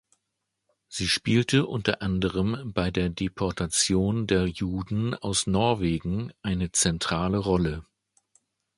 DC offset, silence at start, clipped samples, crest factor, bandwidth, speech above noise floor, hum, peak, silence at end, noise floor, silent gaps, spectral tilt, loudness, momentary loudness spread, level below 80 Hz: under 0.1%; 0.9 s; under 0.1%; 22 dB; 11.5 kHz; 56 dB; none; -6 dBFS; 0.95 s; -81 dBFS; none; -4.5 dB/octave; -26 LUFS; 8 LU; -44 dBFS